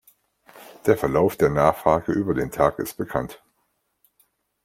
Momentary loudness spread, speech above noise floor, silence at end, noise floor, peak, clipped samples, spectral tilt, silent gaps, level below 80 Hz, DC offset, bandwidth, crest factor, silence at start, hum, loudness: 9 LU; 51 dB; 1.3 s; -72 dBFS; -2 dBFS; under 0.1%; -7 dB/octave; none; -48 dBFS; under 0.1%; 16.5 kHz; 22 dB; 0.55 s; none; -22 LUFS